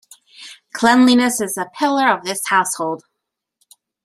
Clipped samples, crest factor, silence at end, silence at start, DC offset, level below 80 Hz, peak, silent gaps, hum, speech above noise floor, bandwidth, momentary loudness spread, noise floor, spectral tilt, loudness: under 0.1%; 18 dB; 1.05 s; 0.4 s; under 0.1%; -64 dBFS; -2 dBFS; none; none; 63 dB; 14 kHz; 21 LU; -79 dBFS; -2.5 dB/octave; -16 LUFS